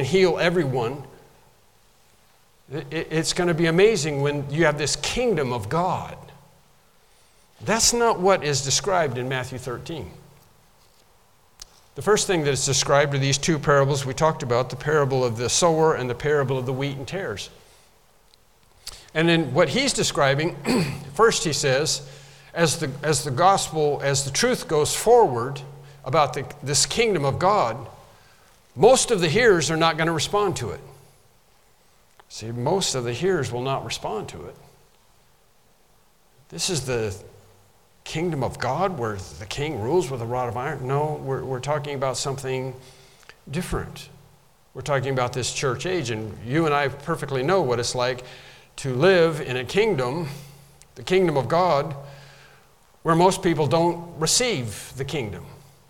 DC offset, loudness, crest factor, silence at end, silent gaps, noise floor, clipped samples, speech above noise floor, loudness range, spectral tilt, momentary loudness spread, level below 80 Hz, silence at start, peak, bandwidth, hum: under 0.1%; -22 LUFS; 20 dB; 0.3 s; none; -60 dBFS; under 0.1%; 38 dB; 8 LU; -4 dB/octave; 16 LU; -48 dBFS; 0 s; -4 dBFS; 17.5 kHz; none